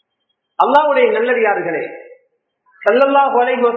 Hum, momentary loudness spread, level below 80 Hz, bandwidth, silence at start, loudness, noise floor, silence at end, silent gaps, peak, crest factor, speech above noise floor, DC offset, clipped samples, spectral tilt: none; 11 LU; -70 dBFS; 5.2 kHz; 0.6 s; -14 LUFS; -71 dBFS; 0 s; none; 0 dBFS; 16 dB; 57 dB; under 0.1%; under 0.1%; -6 dB/octave